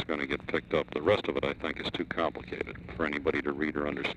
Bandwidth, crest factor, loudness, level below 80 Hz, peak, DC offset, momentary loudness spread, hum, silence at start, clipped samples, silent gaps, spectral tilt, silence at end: 9.8 kHz; 18 dB; -32 LUFS; -52 dBFS; -14 dBFS; under 0.1%; 7 LU; none; 0 s; under 0.1%; none; -6.5 dB/octave; 0 s